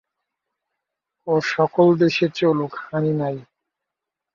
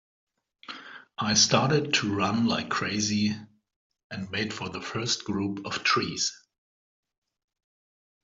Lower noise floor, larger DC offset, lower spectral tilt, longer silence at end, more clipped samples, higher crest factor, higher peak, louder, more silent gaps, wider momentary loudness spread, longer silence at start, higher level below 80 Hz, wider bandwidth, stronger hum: second, -85 dBFS vs under -90 dBFS; neither; first, -7 dB/octave vs -3 dB/octave; second, 0.9 s vs 1.9 s; neither; about the same, 18 dB vs 22 dB; about the same, -4 dBFS vs -6 dBFS; first, -20 LUFS vs -26 LUFS; second, none vs 3.76-3.90 s, 4.04-4.10 s; second, 11 LU vs 19 LU; first, 1.25 s vs 0.7 s; about the same, -66 dBFS vs -66 dBFS; about the same, 7.2 kHz vs 7.8 kHz; neither